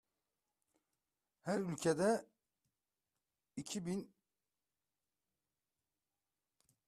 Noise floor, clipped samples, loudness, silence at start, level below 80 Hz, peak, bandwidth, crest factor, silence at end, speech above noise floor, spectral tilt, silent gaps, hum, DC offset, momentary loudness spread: under -90 dBFS; under 0.1%; -39 LUFS; 1.45 s; -80 dBFS; -22 dBFS; 13.5 kHz; 22 dB; 2.8 s; over 52 dB; -5 dB/octave; none; none; under 0.1%; 16 LU